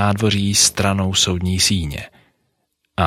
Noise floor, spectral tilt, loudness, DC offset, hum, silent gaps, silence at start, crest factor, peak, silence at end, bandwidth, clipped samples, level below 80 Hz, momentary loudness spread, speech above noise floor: -70 dBFS; -3.5 dB/octave; -16 LUFS; under 0.1%; none; none; 0 s; 18 dB; -2 dBFS; 0 s; 15.5 kHz; under 0.1%; -40 dBFS; 14 LU; 52 dB